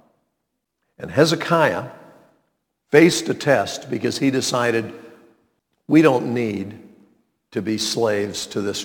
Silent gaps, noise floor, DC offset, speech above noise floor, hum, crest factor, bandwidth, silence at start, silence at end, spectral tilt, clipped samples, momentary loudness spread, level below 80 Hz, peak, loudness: none; -77 dBFS; under 0.1%; 58 dB; none; 22 dB; 18.5 kHz; 1 s; 0 s; -4.5 dB/octave; under 0.1%; 14 LU; -62 dBFS; 0 dBFS; -19 LUFS